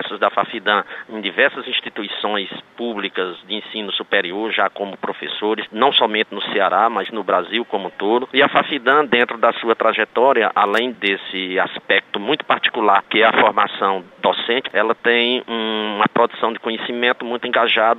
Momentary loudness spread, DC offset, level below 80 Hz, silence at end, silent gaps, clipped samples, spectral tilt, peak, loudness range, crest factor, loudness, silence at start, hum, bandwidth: 9 LU; under 0.1%; -70 dBFS; 0 s; none; under 0.1%; -5.5 dB/octave; -2 dBFS; 6 LU; 18 dB; -18 LUFS; 0 s; none; 9.2 kHz